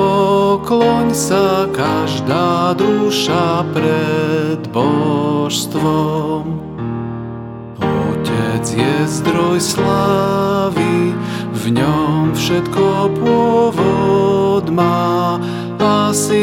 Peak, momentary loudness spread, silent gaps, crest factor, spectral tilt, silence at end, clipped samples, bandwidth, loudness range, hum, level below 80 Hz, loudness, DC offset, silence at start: 0 dBFS; 7 LU; none; 14 dB; -5.5 dB/octave; 0 s; under 0.1%; 17 kHz; 4 LU; none; -44 dBFS; -15 LUFS; under 0.1%; 0 s